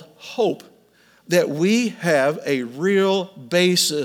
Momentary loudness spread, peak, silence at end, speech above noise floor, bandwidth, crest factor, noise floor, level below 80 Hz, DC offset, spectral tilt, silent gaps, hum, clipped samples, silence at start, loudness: 7 LU; -4 dBFS; 0 s; 36 dB; 19 kHz; 16 dB; -56 dBFS; -76 dBFS; under 0.1%; -4 dB/octave; none; none; under 0.1%; 0 s; -20 LUFS